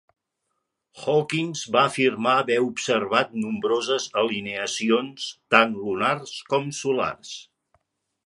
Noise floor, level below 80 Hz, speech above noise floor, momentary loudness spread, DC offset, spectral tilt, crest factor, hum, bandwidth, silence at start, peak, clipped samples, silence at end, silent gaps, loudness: -78 dBFS; -68 dBFS; 55 dB; 10 LU; under 0.1%; -4 dB/octave; 24 dB; none; 11.5 kHz; 0.95 s; 0 dBFS; under 0.1%; 0.85 s; none; -23 LUFS